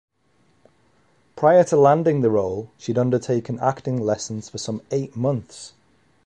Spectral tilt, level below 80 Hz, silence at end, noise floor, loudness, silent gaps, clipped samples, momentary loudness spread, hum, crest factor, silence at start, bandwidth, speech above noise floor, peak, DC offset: -6.5 dB/octave; -58 dBFS; 0.55 s; -63 dBFS; -21 LUFS; none; under 0.1%; 14 LU; none; 18 dB; 1.35 s; 10.5 kHz; 43 dB; -2 dBFS; under 0.1%